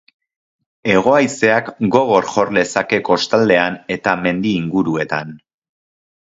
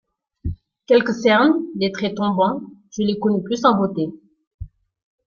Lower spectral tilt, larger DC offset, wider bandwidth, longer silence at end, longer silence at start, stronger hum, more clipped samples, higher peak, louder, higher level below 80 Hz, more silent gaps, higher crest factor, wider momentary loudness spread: about the same, -5 dB/octave vs -6 dB/octave; neither; first, 8 kHz vs 7.2 kHz; first, 0.95 s vs 0.6 s; first, 0.85 s vs 0.45 s; neither; neither; about the same, 0 dBFS vs -2 dBFS; first, -16 LUFS vs -19 LUFS; second, -54 dBFS vs -46 dBFS; second, none vs 4.47-4.59 s; about the same, 16 dB vs 18 dB; second, 7 LU vs 21 LU